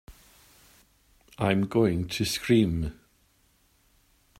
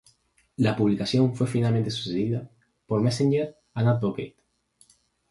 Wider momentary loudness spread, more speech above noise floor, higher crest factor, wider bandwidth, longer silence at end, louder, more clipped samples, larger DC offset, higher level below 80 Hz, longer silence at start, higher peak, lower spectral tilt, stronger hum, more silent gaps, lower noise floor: about the same, 8 LU vs 10 LU; about the same, 40 dB vs 40 dB; about the same, 20 dB vs 16 dB; first, 16 kHz vs 11.5 kHz; first, 1.45 s vs 1 s; about the same, -26 LUFS vs -25 LUFS; neither; neither; first, -50 dBFS vs -58 dBFS; second, 0.1 s vs 0.6 s; about the same, -10 dBFS vs -10 dBFS; second, -5.5 dB/octave vs -7 dB/octave; neither; neither; about the same, -65 dBFS vs -64 dBFS